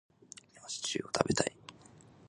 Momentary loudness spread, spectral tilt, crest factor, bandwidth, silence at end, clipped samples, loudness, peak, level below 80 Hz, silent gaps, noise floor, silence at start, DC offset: 22 LU; -3.5 dB/octave; 30 dB; 11.5 kHz; 0.25 s; under 0.1%; -34 LUFS; -6 dBFS; -64 dBFS; none; -58 dBFS; 0.55 s; under 0.1%